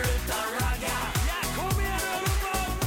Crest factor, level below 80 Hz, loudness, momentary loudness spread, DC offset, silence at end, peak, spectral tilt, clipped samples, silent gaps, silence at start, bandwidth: 12 dB; -32 dBFS; -28 LUFS; 2 LU; under 0.1%; 0 s; -16 dBFS; -3.5 dB/octave; under 0.1%; none; 0 s; 17 kHz